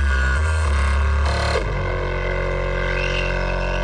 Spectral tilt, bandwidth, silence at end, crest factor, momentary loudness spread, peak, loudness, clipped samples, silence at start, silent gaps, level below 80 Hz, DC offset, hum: -5.5 dB/octave; 10 kHz; 0 s; 12 dB; 4 LU; -8 dBFS; -21 LUFS; under 0.1%; 0 s; none; -22 dBFS; under 0.1%; none